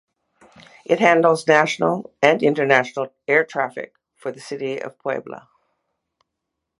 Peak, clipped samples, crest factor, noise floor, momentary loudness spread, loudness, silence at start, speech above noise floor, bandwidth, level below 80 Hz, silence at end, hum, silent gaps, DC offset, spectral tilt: 0 dBFS; under 0.1%; 22 dB; -80 dBFS; 18 LU; -19 LUFS; 0.9 s; 61 dB; 11.5 kHz; -70 dBFS; 1.4 s; none; none; under 0.1%; -5 dB/octave